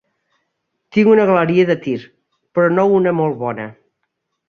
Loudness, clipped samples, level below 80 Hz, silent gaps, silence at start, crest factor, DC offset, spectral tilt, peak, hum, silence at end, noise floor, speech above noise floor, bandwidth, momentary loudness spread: -15 LUFS; under 0.1%; -60 dBFS; none; 0.95 s; 16 dB; under 0.1%; -8.5 dB/octave; -2 dBFS; none; 0.75 s; -73 dBFS; 59 dB; 6.8 kHz; 13 LU